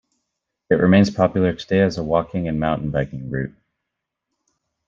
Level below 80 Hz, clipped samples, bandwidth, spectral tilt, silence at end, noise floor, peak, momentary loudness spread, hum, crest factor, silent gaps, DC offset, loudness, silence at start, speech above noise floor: -46 dBFS; under 0.1%; 7.4 kHz; -7.5 dB/octave; 1.4 s; -81 dBFS; -2 dBFS; 12 LU; none; 18 dB; none; under 0.1%; -20 LUFS; 0.7 s; 62 dB